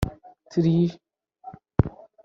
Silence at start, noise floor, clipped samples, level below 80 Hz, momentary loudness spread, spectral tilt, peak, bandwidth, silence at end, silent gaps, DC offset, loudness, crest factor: 0 s; -47 dBFS; under 0.1%; -42 dBFS; 19 LU; -9 dB/octave; -2 dBFS; 7.6 kHz; 0.35 s; none; under 0.1%; -25 LUFS; 24 dB